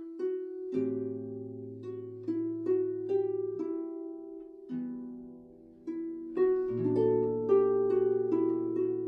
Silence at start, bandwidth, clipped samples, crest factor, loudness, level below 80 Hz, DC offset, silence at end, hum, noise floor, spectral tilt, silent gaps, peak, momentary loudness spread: 0 s; 3.3 kHz; under 0.1%; 16 dB; -32 LUFS; -68 dBFS; under 0.1%; 0 s; none; -53 dBFS; -10.5 dB/octave; none; -16 dBFS; 15 LU